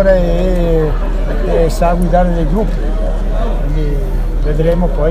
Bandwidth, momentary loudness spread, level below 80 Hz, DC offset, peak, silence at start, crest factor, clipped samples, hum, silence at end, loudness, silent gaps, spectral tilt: 9.6 kHz; 6 LU; -14 dBFS; under 0.1%; 0 dBFS; 0 s; 12 dB; under 0.1%; none; 0 s; -15 LUFS; none; -7.5 dB/octave